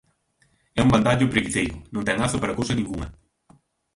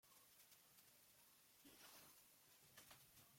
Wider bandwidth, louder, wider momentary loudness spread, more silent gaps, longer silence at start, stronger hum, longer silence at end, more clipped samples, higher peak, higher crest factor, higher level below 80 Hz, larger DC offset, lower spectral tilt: second, 11.5 kHz vs 16.5 kHz; first, -23 LUFS vs -67 LUFS; first, 12 LU vs 6 LU; neither; first, 0.75 s vs 0.05 s; neither; first, 0.85 s vs 0 s; neither; first, -2 dBFS vs -50 dBFS; about the same, 22 dB vs 20 dB; first, -42 dBFS vs under -90 dBFS; neither; first, -5.5 dB/octave vs -1.5 dB/octave